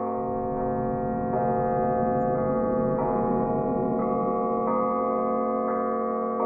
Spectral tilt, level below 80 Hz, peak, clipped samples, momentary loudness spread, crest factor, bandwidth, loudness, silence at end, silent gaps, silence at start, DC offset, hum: -13.5 dB/octave; -48 dBFS; -14 dBFS; under 0.1%; 3 LU; 12 dB; 2.7 kHz; -26 LUFS; 0 s; none; 0 s; under 0.1%; none